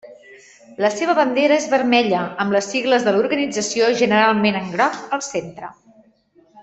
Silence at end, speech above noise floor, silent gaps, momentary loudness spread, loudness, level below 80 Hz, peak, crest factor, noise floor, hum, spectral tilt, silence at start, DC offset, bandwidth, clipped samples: 0 s; 37 dB; none; 10 LU; -18 LUFS; -62 dBFS; -2 dBFS; 18 dB; -55 dBFS; none; -4 dB/octave; 0.05 s; under 0.1%; 8.4 kHz; under 0.1%